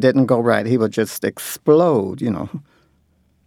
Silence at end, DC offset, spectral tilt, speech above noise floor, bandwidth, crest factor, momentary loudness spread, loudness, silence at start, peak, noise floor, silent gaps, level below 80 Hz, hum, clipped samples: 0.85 s; under 0.1%; -6.5 dB/octave; 43 dB; 18 kHz; 16 dB; 11 LU; -18 LUFS; 0 s; -2 dBFS; -60 dBFS; none; -58 dBFS; none; under 0.1%